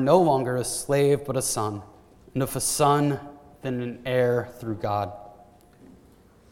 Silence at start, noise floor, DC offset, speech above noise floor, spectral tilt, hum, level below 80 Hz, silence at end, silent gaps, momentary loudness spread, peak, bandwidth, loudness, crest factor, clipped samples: 0 s; -55 dBFS; under 0.1%; 31 dB; -5 dB/octave; none; -56 dBFS; 1.2 s; none; 14 LU; -4 dBFS; 17.5 kHz; -25 LUFS; 20 dB; under 0.1%